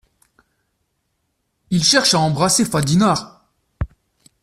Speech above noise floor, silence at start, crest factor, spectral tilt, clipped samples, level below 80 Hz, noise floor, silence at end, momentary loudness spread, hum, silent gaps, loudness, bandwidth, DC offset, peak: 55 dB; 1.7 s; 18 dB; -3.5 dB/octave; under 0.1%; -42 dBFS; -71 dBFS; 0.55 s; 17 LU; none; none; -16 LUFS; 14.5 kHz; under 0.1%; -2 dBFS